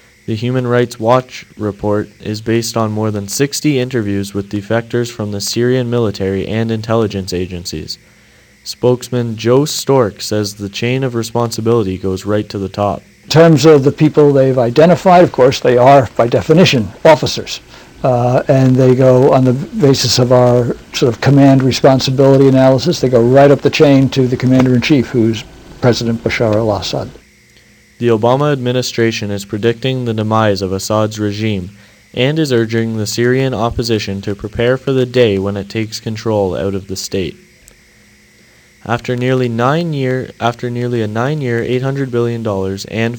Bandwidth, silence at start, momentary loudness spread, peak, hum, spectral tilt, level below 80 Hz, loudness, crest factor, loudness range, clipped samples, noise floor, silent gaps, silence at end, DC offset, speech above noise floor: 19 kHz; 0.3 s; 12 LU; 0 dBFS; none; -6 dB/octave; -44 dBFS; -13 LUFS; 12 dB; 8 LU; 0.2%; -46 dBFS; none; 0 s; under 0.1%; 34 dB